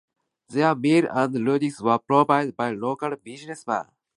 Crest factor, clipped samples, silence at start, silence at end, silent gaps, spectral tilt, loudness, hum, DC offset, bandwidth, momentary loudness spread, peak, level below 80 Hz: 18 dB; under 0.1%; 0.5 s; 0.35 s; none; -6.5 dB/octave; -23 LUFS; none; under 0.1%; 11.5 kHz; 11 LU; -4 dBFS; -72 dBFS